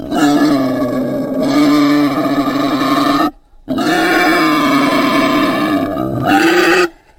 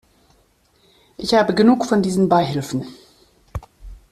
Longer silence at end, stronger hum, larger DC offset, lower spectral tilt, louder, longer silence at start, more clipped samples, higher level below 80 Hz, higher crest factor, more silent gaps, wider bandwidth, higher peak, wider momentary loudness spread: about the same, 0.25 s vs 0.15 s; neither; neither; about the same, -5 dB/octave vs -6 dB/octave; first, -13 LUFS vs -18 LUFS; second, 0 s vs 1.2 s; neither; about the same, -42 dBFS vs -46 dBFS; second, 12 dB vs 18 dB; neither; first, 16.5 kHz vs 14 kHz; first, 0 dBFS vs -4 dBFS; second, 6 LU vs 20 LU